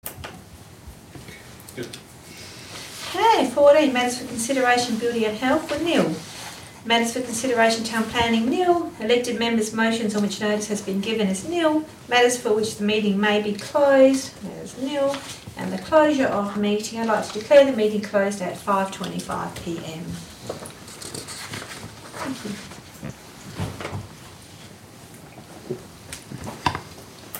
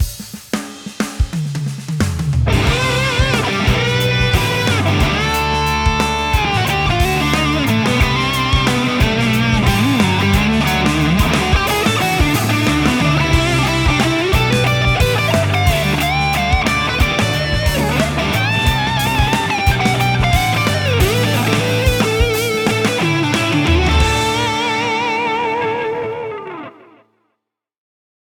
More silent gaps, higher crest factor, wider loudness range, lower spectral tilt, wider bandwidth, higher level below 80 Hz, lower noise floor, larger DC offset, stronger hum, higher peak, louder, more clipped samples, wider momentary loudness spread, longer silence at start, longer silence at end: neither; about the same, 18 dB vs 14 dB; first, 14 LU vs 3 LU; about the same, -4 dB/octave vs -5 dB/octave; second, 16 kHz vs over 20 kHz; second, -56 dBFS vs -24 dBFS; second, -44 dBFS vs -75 dBFS; neither; neither; about the same, -4 dBFS vs -2 dBFS; second, -22 LUFS vs -15 LUFS; neither; first, 21 LU vs 6 LU; about the same, 0.05 s vs 0 s; second, 0 s vs 1.65 s